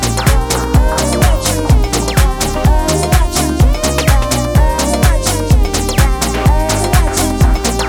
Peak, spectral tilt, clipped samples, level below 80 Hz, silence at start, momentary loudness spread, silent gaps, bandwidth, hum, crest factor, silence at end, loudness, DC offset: 0 dBFS; -4.5 dB/octave; under 0.1%; -14 dBFS; 0 s; 2 LU; none; 19.5 kHz; none; 12 dB; 0 s; -13 LUFS; under 0.1%